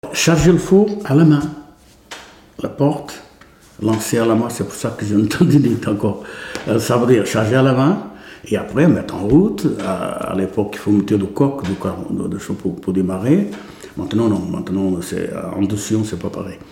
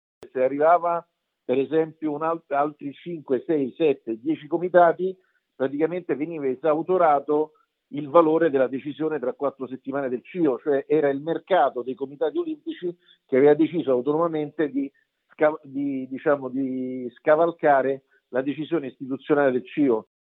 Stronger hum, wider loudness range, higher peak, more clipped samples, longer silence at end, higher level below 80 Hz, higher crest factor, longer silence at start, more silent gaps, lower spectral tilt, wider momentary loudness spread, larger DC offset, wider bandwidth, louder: neither; about the same, 4 LU vs 3 LU; about the same, -2 dBFS vs -2 dBFS; neither; second, 0.05 s vs 0.3 s; first, -44 dBFS vs -82 dBFS; second, 16 dB vs 22 dB; second, 0.05 s vs 0.2 s; neither; second, -6.5 dB/octave vs -10 dB/octave; first, 15 LU vs 12 LU; neither; first, 17 kHz vs 4.1 kHz; first, -17 LUFS vs -24 LUFS